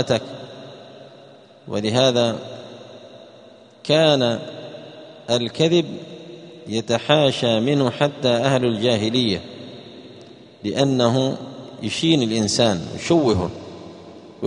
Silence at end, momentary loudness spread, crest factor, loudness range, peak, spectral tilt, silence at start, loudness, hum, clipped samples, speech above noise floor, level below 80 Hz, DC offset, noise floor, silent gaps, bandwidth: 0 s; 22 LU; 20 dB; 4 LU; 0 dBFS; -5 dB/octave; 0 s; -20 LUFS; none; under 0.1%; 27 dB; -56 dBFS; under 0.1%; -46 dBFS; none; 10.5 kHz